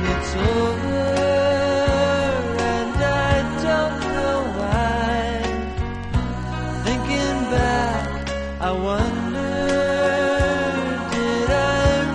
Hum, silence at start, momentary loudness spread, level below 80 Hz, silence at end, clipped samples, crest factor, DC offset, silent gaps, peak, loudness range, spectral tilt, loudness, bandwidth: none; 0 s; 6 LU; -30 dBFS; 0 s; under 0.1%; 16 dB; under 0.1%; none; -4 dBFS; 3 LU; -5.5 dB/octave; -21 LUFS; 11 kHz